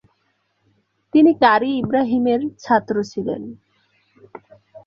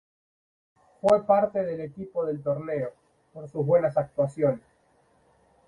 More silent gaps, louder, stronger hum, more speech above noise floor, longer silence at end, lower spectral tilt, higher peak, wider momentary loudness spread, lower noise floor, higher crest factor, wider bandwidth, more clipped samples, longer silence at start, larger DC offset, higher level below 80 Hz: neither; first, -18 LUFS vs -26 LUFS; neither; first, 50 dB vs 39 dB; second, 0.1 s vs 1.1 s; second, -6.5 dB/octave vs -8.5 dB/octave; first, -2 dBFS vs -8 dBFS; about the same, 13 LU vs 13 LU; about the same, -67 dBFS vs -64 dBFS; about the same, 18 dB vs 20 dB; second, 7.2 kHz vs 11 kHz; neither; about the same, 1.15 s vs 1.05 s; neither; about the same, -62 dBFS vs -64 dBFS